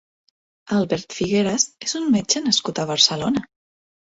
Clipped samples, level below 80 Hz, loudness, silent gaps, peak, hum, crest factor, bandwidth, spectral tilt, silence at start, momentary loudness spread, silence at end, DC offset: under 0.1%; -56 dBFS; -20 LUFS; none; -2 dBFS; none; 20 dB; 8.2 kHz; -3 dB/octave; 0.65 s; 8 LU; 0.7 s; under 0.1%